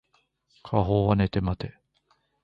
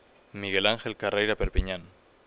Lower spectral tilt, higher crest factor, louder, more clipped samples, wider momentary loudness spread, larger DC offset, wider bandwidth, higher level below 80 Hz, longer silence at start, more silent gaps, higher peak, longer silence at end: first, -10 dB/octave vs -2.5 dB/octave; about the same, 20 dB vs 22 dB; about the same, -26 LUFS vs -28 LUFS; neither; about the same, 11 LU vs 12 LU; neither; first, 5.4 kHz vs 4 kHz; about the same, -42 dBFS vs -38 dBFS; first, 0.65 s vs 0.35 s; neither; about the same, -8 dBFS vs -6 dBFS; first, 0.75 s vs 0.4 s